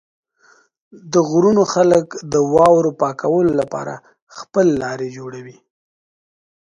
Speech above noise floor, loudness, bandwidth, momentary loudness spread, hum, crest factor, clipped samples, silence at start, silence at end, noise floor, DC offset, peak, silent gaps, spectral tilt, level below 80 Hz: 38 dB; -16 LUFS; 11 kHz; 18 LU; none; 18 dB; under 0.1%; 0.95 s; 1.15 s; -54 dBFS; under 0.1%; 0 dBFS; 4.22-4.27 s; -6 dB/octave; -54 dBFS